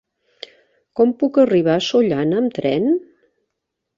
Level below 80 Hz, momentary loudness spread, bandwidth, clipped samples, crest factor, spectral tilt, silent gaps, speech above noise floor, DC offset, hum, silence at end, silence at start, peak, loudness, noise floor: -60 dBFS; 23 LU; 7.6 kHz; under 0.1%; 16 dB; -6.5 dB/octave; none; 62 dB; under 0.1%; none; 1 s; 0.95 s; -4 dBFS; -17 LUFS; -78 dBFS